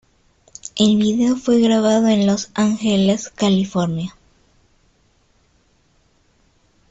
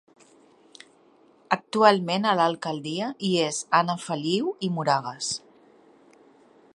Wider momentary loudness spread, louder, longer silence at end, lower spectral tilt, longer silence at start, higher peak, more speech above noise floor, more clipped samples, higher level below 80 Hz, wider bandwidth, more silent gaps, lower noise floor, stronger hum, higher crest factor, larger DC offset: about the same, 9 LU vs 11 LU; first, -17 LUFS vs -25 LUFS; first, 2.8 s vs 1.35 s; first, -5.5 dB/octave vs -4 dB/octave; second, 0.75 s vs 1.5 s; about the same, -4 dBFS vs -2 dBFS; first, 43 dB vs 34 dB; neither; first, -54 dBFS vs -74 dBFS; second, 8.2 kHz vs 11.5 kHz; neither; about the same, -59 dBFS vs -58 dBFS; neither; second, 16 dB vs 24 dB; neither